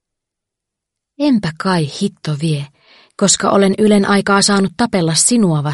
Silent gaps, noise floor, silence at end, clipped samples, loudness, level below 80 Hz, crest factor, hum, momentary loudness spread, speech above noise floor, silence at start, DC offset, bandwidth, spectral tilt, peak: none; -81 dBFS; 0 s; under 0.1%; -14 LUFS; -52 dBFS; 16 dB; none; 9 LU; 67 dB; 1.2 s; under 0.1%; 11.5 kHz; -4 dB/octave; 0 dBFS